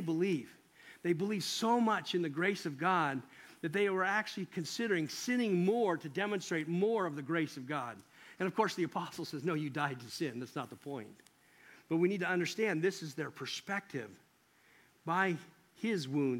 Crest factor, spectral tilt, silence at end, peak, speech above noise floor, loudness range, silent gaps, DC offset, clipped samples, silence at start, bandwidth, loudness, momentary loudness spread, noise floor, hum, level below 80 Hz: 20 dB; -5 dB/octave; 0 s; -16 dBFS; 33 dB; 4 LU; none; under 0.1%; under 0.1%; 0 s; 16.5 kHz; -35 LUFS; 12 LU; -68 dBFS; none; -84 dBFS